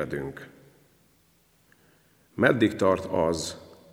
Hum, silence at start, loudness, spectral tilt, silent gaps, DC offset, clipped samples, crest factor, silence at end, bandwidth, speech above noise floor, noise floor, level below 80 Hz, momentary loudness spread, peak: none; 0 s; -25 LUFS; -5.5 dB/octave; none; under 0.1%; under 0.1%; 24 dB; 0.2 s; 16.5 kHz; 39 dB; -64 dBFS; -56 dBFS; 22 LU; -4 dBFS